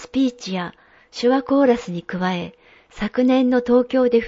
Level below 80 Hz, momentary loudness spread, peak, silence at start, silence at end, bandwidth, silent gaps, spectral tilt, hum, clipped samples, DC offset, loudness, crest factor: -52 dBFS; 12 LU; -6 dBFS; 0 s; 0 s; 7.8 kHz; none; -6.5 dB/octave; none; under 0.1%; under 0.1%; -20 LUFS; 14 dB